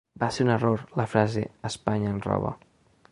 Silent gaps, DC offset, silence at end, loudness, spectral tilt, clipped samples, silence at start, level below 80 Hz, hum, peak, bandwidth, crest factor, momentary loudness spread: none; under 0.1%; 0.55 s; -27 LUFS; -6.5 dB/octave; under 0.1%; 0.15 s; -52 dBFS; none; -6 dBFS; 11 kHz; 22 dB; 8 LU